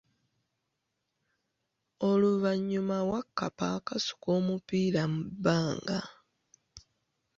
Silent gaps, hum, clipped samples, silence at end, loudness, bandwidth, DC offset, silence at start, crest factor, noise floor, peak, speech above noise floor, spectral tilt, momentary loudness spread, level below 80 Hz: none; none; under 0.1%; 0.6 s; -31 LUFS; 7.6 kHz; under 0.1%; 2 s; 22 dB; -83 dBFS; -10 dBFS; 53 dB; -6 dB/octave; 7 LU; -66 dBFS